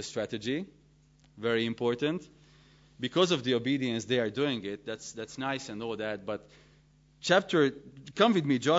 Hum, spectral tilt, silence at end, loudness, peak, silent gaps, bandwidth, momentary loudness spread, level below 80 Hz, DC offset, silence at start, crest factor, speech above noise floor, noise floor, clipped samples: none; -5 dB/octave; 0 s; -30 LUFS; -10 dBFS; none; 8 kHz; 14 LU; -68 dBFS; under 0.1%; 0 s; 20 dB; 32 dB; -62 dBFS; under 0.1%